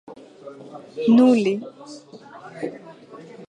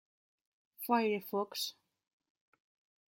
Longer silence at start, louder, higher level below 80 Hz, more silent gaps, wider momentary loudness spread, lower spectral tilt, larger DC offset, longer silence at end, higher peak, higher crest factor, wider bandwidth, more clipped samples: second, 0.1 s vs 0.8 s; first, -19 LUFS vs -35 LUFS; first, -76 dBFS vs under -90 dBFS; neither; first, 27 LU vs 9 LU; first, -6.5 dB/octave vs -3.5 dB/octave; neither; second, 0.05 s vs 1.35 s; first, -6 dBFS vs -16 dBFS; second, 18 dB vs 24 dB; second, 9.6 kHz vs 16.5 kHz; neither